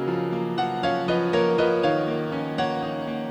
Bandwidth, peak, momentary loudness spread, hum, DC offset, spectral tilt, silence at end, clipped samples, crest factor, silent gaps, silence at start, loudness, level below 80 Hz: 9.2 kHz; -10 dBFS; 7 LU; none; under 0.1%; -7 dB/octave; 0 s; under 0.1%; 14 dB; none; 0 s; -24 LUFS; -56 dBFS